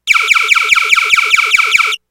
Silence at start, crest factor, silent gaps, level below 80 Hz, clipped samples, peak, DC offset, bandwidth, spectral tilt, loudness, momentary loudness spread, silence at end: 0.05 s; 12 dB; none; -60 dBFS; 0.6%; 0 dBFS; 0.2%; over 20 kHz; 3 dB/octave; -8 LUFS; 1 LU; 0.15 s